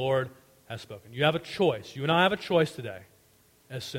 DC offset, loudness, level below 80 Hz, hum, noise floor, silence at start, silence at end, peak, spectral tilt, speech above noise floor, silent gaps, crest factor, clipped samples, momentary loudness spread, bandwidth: under 0.1%; -27 LUFS; -64 dBFS; none; -62 dBFS; 0 s; 0 s; -8 dBFS; -5.5 dB/octave; 34 dB; none; 20 dB; under 0.1%; 18 LU; 16.5 kHz